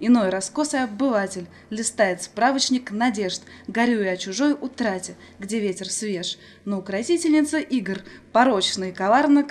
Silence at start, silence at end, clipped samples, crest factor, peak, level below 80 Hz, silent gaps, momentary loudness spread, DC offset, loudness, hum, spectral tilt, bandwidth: 0 s; 0 s; under 0.1%; 18 dB; -4 dBFS; -64 dBFS; none; 11 LU; under 0.1%; -23 LUFS; none; -3.5 dB/octave; 12.5 kHz